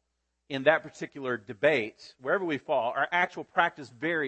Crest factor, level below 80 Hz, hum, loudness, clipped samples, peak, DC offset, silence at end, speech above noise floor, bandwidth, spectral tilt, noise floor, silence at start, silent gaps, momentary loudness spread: 22 dB; -76 dBFS; none; -28 LUFS; under 0.1%; -8 dBFS; under 0.1%; 0 s; 47 dB; 8.6 kHz; -5.5 dB/octave; -75 dBFS; 0.5 s; none; 12 LU